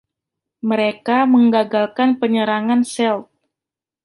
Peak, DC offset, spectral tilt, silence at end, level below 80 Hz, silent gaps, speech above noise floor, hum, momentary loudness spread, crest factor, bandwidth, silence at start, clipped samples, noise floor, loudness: -4 dBFS; under 0.1%; -5 dB/octave; 0.8 s; -68 dBFS; none; 72 dB; none; 7 LU; 14 dB; 11.5 kHz; 0.65 s; under 0.1%; -88 dBFS; -17 LUFS